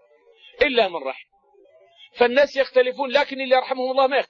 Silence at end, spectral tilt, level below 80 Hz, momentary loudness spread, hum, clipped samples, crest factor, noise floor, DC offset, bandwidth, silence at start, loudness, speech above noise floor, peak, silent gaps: 0.05 s; -3.5 dB/octave; -58 dBFS; 7 LU; none; under 0.1%; 18 dB; -55 dBFS; under 0.1%; 7 kHz; 0.6 s; -20 LUFS; 35 dB; -4 dBFS; none